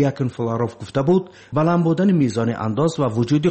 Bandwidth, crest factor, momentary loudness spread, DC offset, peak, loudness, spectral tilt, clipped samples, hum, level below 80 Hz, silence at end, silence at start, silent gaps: 8.6 kHz; 12 dB; 6 LU; under 0.1%; -6 dBFS; -20 LUFS; -8 dB/octave; under 0.1%; none; -54 dBFS; 0 s; 0 s; none